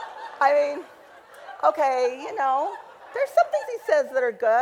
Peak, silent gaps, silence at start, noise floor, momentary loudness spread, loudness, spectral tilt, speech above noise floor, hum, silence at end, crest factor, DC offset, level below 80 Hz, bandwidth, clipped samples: -6 dBFS; none; 0 s; -47 dBFS; 15 LU; -23 LUFS; -2.5 dB/octave; 25 dB; none; 0 s; 18 dB; under 0.1%; -76 dBFS; 16 kHz; under 0.1%